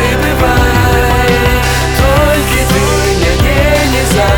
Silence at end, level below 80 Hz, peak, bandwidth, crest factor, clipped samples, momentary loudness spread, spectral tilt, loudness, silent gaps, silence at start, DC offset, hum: 0 s; -16 dBFS; 0 dBFS; over 20 kHz; 8 dB; under 0.1%; 2 LU; -4.5 dB/octave; -10 LUFS; none; 0 s; 0.3%; none